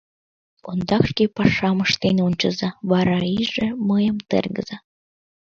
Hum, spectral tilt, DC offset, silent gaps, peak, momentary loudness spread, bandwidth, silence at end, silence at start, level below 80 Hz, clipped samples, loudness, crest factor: none; -6 dB/octave; under 0.1%; none; 0 dBFS; 9 LU; 7 kHz; 0.7 s; 0.65 s; -48 dBFS; under 0.1%; -21 LUFS; 20 dB